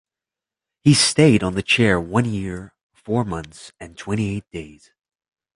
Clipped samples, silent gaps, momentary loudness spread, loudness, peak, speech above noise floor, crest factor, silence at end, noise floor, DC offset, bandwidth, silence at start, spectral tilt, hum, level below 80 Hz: under 0.1%; 2.83-2.90 s; 21 LU; -19 LUFS; -2 dBFS; 69 dB; 20 dB; 0.85 s; -89 dBFS; under 0.1%; 11.5 kHz; 0.85 s; -4.5 dB/octave; none; -46 dBFS